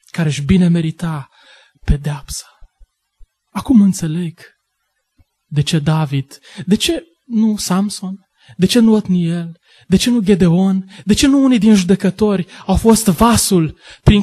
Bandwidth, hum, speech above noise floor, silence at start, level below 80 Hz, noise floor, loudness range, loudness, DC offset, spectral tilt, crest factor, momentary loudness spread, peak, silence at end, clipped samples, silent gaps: 13 kHz; none; 56 dB; 0.15 s; -30 dBFS; -70 dBFS; 7 LU; -15 LUFS; under 0.1%; -5.5 dB/octave; 14 dB; 15 LU; 0 dBFS; 0 s; under 0.1%; none